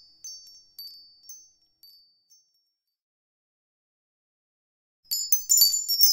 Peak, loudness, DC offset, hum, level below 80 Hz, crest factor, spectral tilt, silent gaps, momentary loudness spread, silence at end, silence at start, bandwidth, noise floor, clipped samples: -4 dBFS; -20 LUFS; under 0.1%; none; -70 dBFS; 26 dB; 4.5 dB/octave; 3.02-5.03 s; 26 LU; 0 s; 0.25 s; 17 kHz; -76 dBFS; under 0.1%